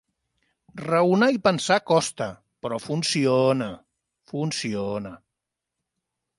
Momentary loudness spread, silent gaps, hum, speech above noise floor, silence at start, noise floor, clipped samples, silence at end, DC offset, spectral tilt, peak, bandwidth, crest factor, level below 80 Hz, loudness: 15 LU; none; none; 62 dB; 0.75 s; -84 dBFS; under 0.1%; 1.2 s; under 0.1%; -5 dB/octave; -6 dBFS; 11.5 kHz; 20 dB; -64 dBFS; -23 LUFS